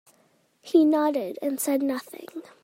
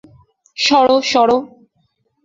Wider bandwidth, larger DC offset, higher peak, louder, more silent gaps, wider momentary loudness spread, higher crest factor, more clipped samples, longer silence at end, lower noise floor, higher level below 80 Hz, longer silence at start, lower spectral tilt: first, 16.5 kHz vs 7.8 kHz; neither; second, -8 dBFS vs -2 dBFS; second, -24 LUFS vs -14 LUFS; neither; first, 20 LU vs 7 LU; about the same, 18 dB vs 16 dB; neither; second, 0.2 s vs 0.8 s; about the same, -64 dBFS vs -64 dBFS; second, -78 dBFS vs -56 dBFS; about the same, 0.65 s vs 0.6 s; about the same, -3.5 dB/octave vs -2.5 dB/octave